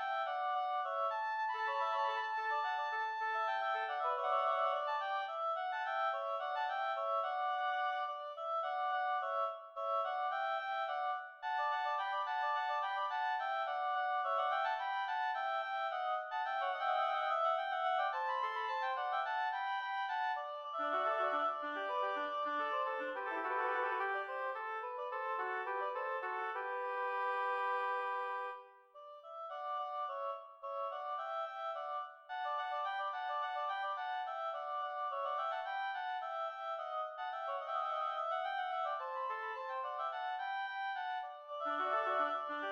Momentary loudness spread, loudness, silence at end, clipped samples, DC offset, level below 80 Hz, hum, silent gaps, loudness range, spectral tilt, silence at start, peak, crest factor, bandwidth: 6 LU; -38 LUFS; 0 s; under 0.1%; under 0.1%; under -90 dBFS; none; none; 4 LU; -1 dB/octave; 0 s; -24 dBFS; 14 dB; 7 kHz